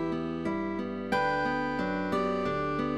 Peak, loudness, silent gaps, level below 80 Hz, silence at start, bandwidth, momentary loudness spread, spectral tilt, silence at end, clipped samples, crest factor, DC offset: -16 dBFS; -30 LUFS; none; -56 dBFS; 0 s; 13 kHz; 4 LU; -7 dB/octave; 0 s; under 0.1%; 14 dB; 0.2%